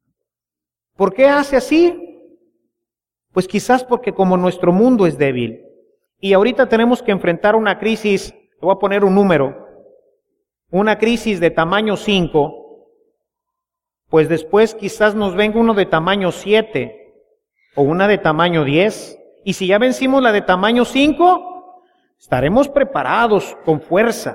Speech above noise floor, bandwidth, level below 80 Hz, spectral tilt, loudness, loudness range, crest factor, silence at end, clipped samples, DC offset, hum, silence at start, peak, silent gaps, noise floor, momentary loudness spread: 74 dB; 16 kHz; -46 dBFS; -6 dB/octave; -15 LUFS; 3 LU; 14 dB; 0 s; under 0.1%; under 0.1%; none; 1 s; -2 dBFS; none; -88 dBFS; 9 LU